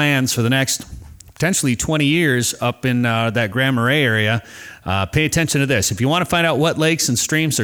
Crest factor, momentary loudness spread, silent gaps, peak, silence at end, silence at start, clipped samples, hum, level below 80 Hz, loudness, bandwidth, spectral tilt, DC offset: 12 dB; 6 LU; none; -6 dBFS; 0 s; 0 s; under 0.1%; none; -44 dBFS; -17 LUFS; over 20 kHz; -4 dB/octave; under 0.1%